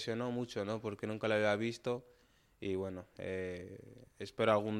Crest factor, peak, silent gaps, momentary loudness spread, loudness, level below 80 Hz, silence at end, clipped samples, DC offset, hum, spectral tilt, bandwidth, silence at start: 20 dB; -16 dBFS; none; 16 LU; -38 LUFS; -72 dBFS; 0 s; under 0.1%; under 0.1%; none; -6 dB/octave; 14 kHz; 0 s